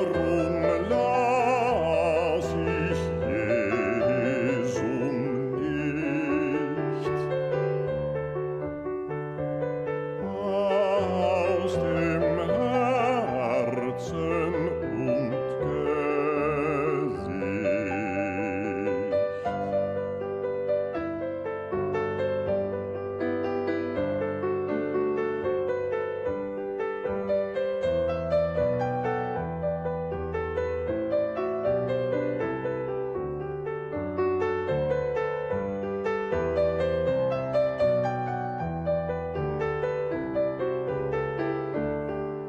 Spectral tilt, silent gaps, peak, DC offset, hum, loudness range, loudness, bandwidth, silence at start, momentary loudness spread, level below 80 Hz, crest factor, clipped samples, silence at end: -7.5 dB/octave; none; -12 dBFS; under 0.1%; none; 4 LU; -28 LUFS; 9.6 kHz; 0 s; 7 LU; -52 dBFS; 14 dB; under 0.1%; 0 s